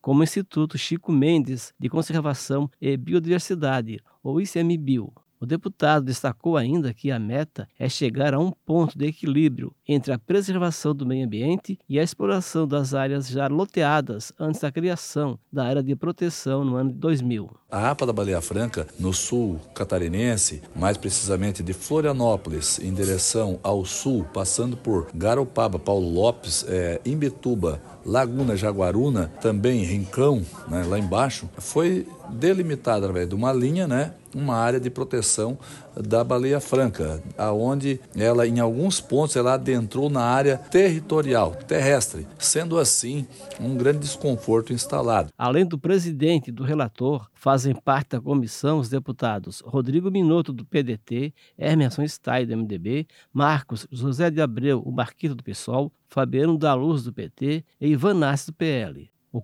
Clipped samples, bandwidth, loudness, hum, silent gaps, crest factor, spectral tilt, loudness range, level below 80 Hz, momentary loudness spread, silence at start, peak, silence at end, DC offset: under 0.1%; 13.5 kHz; -24 LUFS; none; none; 18 dB; -5.5 dB/octave; 3 LU; -50 dBFS; 7 LU; 0.05 s; -6 dBFS; 0 s; under 0.1%